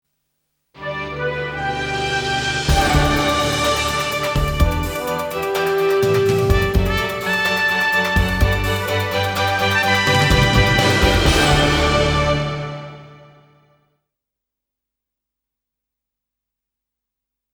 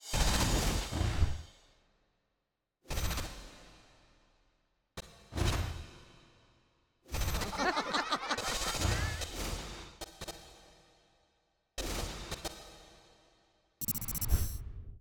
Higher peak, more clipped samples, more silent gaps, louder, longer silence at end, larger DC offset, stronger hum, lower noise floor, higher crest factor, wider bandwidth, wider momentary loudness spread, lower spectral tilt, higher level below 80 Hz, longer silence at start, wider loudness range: first, -2 dBFS vs -14 dBFS; neither; neither; first, -17 LUFS vs -35 LUFS; first, 4.4 s vs 0 s; neither; neither; about the same, -83 dBFS vs -85 dBFS; about the same, 18 dB vs 22 dB; about the same, 20 kHz vs over 20 kHz; second, 9 LU vs 19 LU; about the same, -4.5 dB/octave vs -3.5 dB/octave; first, -28 dBFS vs -42 dBFS; first, 0.75 s vs 0 s; second, 5 LU vs 10 LU